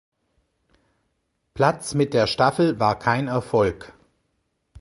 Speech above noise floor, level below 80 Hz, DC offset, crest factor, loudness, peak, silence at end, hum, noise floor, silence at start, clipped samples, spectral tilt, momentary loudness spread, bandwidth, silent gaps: 52 dB; -52 dBFS; under 0.1%; 20 dB; -21 LUFS; -4 dBFS; 0.95 s; none; -73 dBFS; 1.55 s; under 0.1%; -5.5 dB/octave; 5 LU; 11.5 kHz; none